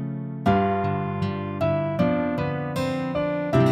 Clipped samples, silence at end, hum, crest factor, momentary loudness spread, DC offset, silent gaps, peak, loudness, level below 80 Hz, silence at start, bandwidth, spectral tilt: under 0.1%; 0 s; none; 16 dB; 5 LU; under 0.1%; none; -6 dBFS; -25 LUFS; -48 dBFS; 0 s; 15 kHz; -8 dB/octave